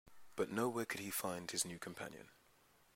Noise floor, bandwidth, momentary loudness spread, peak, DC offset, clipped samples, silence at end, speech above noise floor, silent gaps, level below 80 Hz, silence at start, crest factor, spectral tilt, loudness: -71 dBFS; 16 kHz; 12 LU; -24 dBFS; under 0.1%; under 0.1%; 0.6 s; 28 dB; none; -78 dBFS; 0.05 s; 20 dB; -3 dB/octave; -42 LUFS